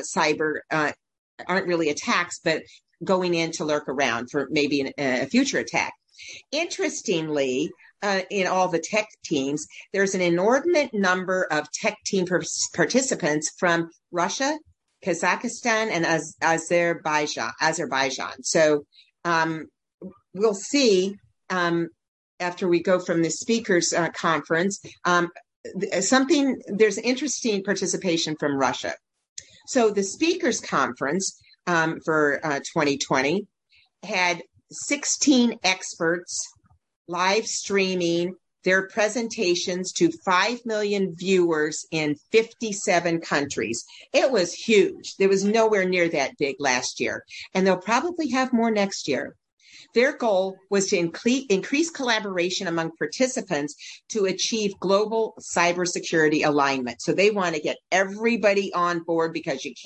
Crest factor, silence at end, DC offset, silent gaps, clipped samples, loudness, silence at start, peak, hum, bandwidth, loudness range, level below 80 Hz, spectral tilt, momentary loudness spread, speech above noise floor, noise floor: 20 dB; 0 s; under 0.1%; 1.19-1.38 s, 19.94-19.98 s, 22.08-22.38 s, 25.56-25.64 s, 29.29-29.36 s, 36.96-37.05 s, 49.52-49.57 s; under 0.1%; -24 LUFS; 0 s; -4 dBFS; none; 9.4 kHz; 3 LU; -68 dBFS; -3.5 dB/octave; 8 LU; 39 dB; -63 dBFS